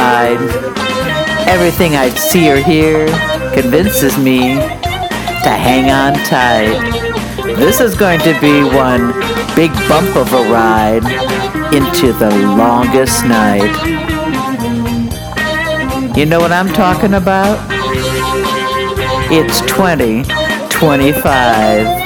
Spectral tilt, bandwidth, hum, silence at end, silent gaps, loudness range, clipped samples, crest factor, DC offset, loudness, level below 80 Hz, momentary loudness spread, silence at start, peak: -5 dB/octave; over 20 kHz; none; 0 s; none; 2 LU; 0.3%; 10 dB; under 0.1%; -11 LUFS; -28 dBFS; 6 LU; 0 s; 0 dBFS